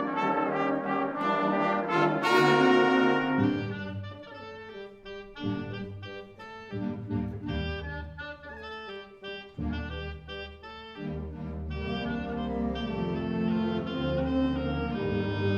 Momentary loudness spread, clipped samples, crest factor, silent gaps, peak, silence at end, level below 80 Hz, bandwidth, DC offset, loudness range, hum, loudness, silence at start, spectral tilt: 19 LU; under 0.1%; 20 dB; none; -10 dBFS; 0 s; -46 dBFS; 14 kHz; under 0.1%; 13 LU; none; -29 LUFS; 0 s; -7 dB/octave